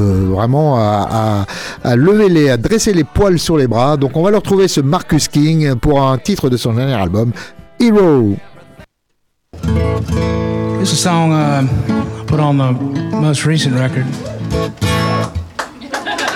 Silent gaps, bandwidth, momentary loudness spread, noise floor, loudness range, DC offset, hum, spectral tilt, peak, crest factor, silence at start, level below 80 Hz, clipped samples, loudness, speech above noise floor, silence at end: none; 17 kHz; 9 LU; -66 dBFS; 4 LU; under 0.1%; none; -6 dB/octave; -2 dBFS; 12 dB; 0 s; -32 dBFS; under 0.1%; -14 LUFS; 53 dB; 0 s